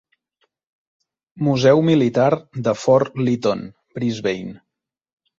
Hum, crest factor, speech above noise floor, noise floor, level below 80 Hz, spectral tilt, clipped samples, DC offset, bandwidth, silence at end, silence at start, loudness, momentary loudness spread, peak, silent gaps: none; 18 dB; 52 dB; -70 dBFS; -58 dBFS; -7 dB/octave; under 0.1%; under 0.1%; 7.6 kHz; 0.85 s; 1.35 s; -19 LUFS; 13 LU; -2 dBFS; none